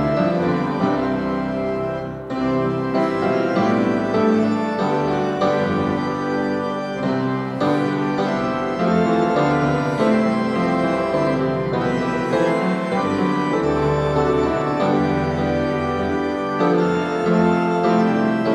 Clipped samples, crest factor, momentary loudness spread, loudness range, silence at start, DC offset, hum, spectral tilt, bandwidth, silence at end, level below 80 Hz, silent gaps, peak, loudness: under 0.1%; 14 dB; 5 LU; 2 LU; 0 s; under 0.1%; none; -7.5 dB/octave; 11 kHz; 0 s; -44 dBFS; none; -6 dBFS; -20 LUFS